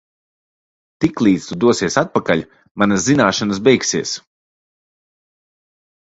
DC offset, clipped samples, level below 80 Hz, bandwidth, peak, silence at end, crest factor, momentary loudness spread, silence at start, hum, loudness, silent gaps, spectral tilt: under 0.1%; under 0.1%; -52 dBFS; 8 kHz; 0 dBFS; 1.85 s; 18 dB; 7 LU; 1 s; none; -16 LUFS; 2.71-2.75 s; -4.5 dB/octave